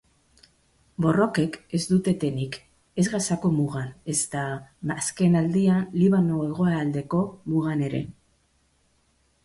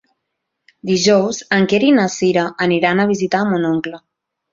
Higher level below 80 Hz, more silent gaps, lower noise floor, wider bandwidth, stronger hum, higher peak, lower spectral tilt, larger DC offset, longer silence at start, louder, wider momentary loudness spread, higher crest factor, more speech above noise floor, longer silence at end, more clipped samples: about the same, -58 dBFS vs -58 dBFS; neither; second, -66 dBFS vs -76 dBFS; first, 11.5 kHz vs 7.6 kHz; neither; second, -8 dBFS vs -2 dBFS; about the same, -6 dB/octave vs -5 dB/octave; neither; first, 1 s vs 0.85 s; second, -25 LUFS vs -16 LUFS; first, 11 LU vs 7 LU; about the same, 16 dB vs 16 dB; second, 42 dB vs 60 dB; first, 1.35 s vs 0.55 s; neither